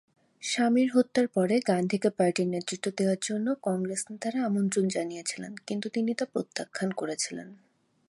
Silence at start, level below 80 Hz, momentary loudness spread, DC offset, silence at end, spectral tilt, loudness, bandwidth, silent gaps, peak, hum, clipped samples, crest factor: 0.4 s; -76 dBFS; 9 LU; under 0.1%; 0.55 s; -5 dB/octave; -29 LUFS; 11.5 kHz; none; -10 dBFS; none; under 0.1%; 18 dB